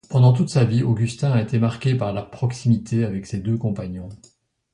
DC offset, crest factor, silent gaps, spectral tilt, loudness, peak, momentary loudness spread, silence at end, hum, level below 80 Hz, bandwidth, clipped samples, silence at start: under 0.1%; 16 dB; none; -7.5 dB/octave; -21 LUFS; -4 dBFS; 11 LU; 0.6 s; none; -48 dBFS; 10.5 kHz; under 0.1%; 0.1 s